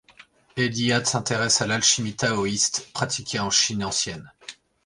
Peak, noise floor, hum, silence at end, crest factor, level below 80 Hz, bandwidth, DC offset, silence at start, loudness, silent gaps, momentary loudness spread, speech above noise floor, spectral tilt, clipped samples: -6 dBFS; -53 dBFS; none; 0.3 s; 18 dB; -56 dBFS; 11.5 kHz; under 0.1%; 0.2 s; -22 LUFS; none; 15 LU; 29 dB; -2.5 dB/octave; under 0.1%